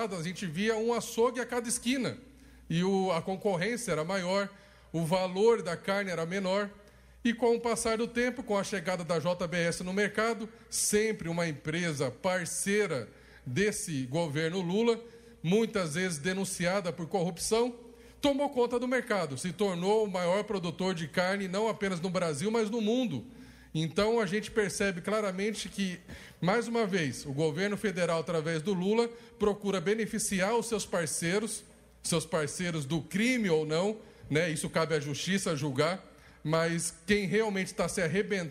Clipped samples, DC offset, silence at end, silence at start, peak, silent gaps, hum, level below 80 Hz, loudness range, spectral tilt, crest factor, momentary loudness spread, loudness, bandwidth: under 0.1%; under 0.1%; 0 s; 0 s; -14 dBFS; none; none; -60 dBFS; 1 LU; -4.5 dB/octave; 18 dB; 6 LU; -31 LUFS; 16 kHz